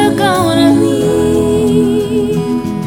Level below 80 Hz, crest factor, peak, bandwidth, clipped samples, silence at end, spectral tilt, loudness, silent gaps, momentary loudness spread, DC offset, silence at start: -36 dBFS; 10 dB; 0 dBFS; 17 kHz; under 0.1%; 0 s; -6 dB/octave; -12 LUFS; none; 5 LU; under 0.1%; 0 s